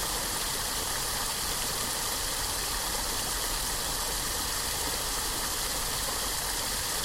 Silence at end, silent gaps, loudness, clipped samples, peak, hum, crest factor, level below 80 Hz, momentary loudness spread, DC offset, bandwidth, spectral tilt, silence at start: 0 s; none; -29 LUFS; under 0.1%; -14 dBFS; none; 16 dB; -42 dBFS; 0 LU; under 0.1%; 16.5 kHz; -1 dB/octave; 0 s